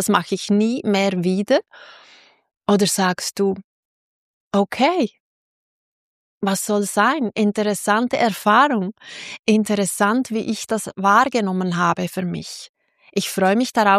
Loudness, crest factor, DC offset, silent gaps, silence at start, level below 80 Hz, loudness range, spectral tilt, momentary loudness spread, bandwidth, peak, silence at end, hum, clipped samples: -19 LUFS; 18 dB; under 0.1%; 3.64-4.51 s, 5.20-6.41 s, 9.39-9.43 s, 12.69-12.74 s; 0 s; -64 dBFS; 4 LU; -4.5 dB/octave; 10 LU; 15.5 kHz; -2 dBFS; 0 s; none; under 0.1%